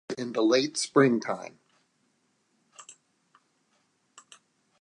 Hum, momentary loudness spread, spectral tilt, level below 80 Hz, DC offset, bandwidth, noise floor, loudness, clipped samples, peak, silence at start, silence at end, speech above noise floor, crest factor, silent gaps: none; 25 LU; -4.5 dB/octave; -84 dBFS; under 0.1%; 11 kHz; -72 dBFS; -26 LUFS; under 0.1%; -6 dBFS; 0.1 s; 1.9 s; 47 dB; 24 dB; none